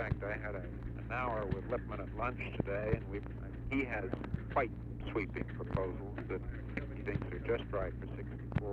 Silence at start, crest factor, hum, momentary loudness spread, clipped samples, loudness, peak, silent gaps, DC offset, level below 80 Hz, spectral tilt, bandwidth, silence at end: 0 s; 22 dB; none; 7 LU; under 0.1%; -39 LUFS; -18 dBFS; none; under 0.1%; -46 dBFS; -9 dB/octave; 5 kHz; 0 s